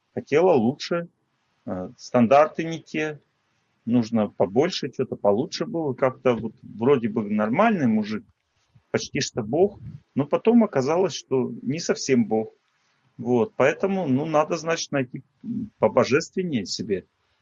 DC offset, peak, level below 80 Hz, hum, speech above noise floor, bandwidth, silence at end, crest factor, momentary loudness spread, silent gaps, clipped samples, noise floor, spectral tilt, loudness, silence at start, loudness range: under 0.1%; -4 dBFS; -66 dBFS; none; 47 dB; 7.6 kHz; 0.4 s; 18 dB; 13 LU; none; under 0.1%; -70 dBFS; -5.5 dB/octave; -23 LUFS; 0.15 s; 2 LU